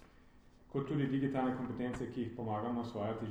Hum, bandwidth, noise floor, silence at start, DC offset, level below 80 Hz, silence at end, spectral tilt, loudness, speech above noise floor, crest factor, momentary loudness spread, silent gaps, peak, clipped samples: none; 9.4 kHz; -61 dBFS; 0 s; under 0.1%; -62 dBFS; 0 s; -8 dB/octave; -38 LUFS; 24 dB; 16 dB; 6 LU; none; -22 dBFS; under 0.1%